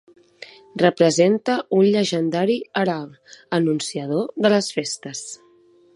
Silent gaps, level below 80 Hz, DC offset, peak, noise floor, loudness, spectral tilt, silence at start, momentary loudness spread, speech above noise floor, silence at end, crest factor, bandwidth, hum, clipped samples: none; -70 dBFS; under 0.1%; -2 dBFS; -54 dBFS; -20 LUFS; -5 dB/octave; 0.4 s; 15 LU; 34 dB; 0.6 s; 18 dB; 11.5 kHz; none; under 0.1%